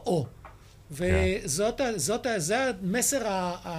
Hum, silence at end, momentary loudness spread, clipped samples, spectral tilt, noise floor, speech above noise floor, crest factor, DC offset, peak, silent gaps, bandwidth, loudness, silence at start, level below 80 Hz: none; 0 s; 6 LU; under 0.1%; -4 dB/octave; -49 dBFS; 22 dB; 16 dB; under 0.1%; -12 dBFS; none; 15.5 kHz; -27 LUFS; 0 s; -42 dBFS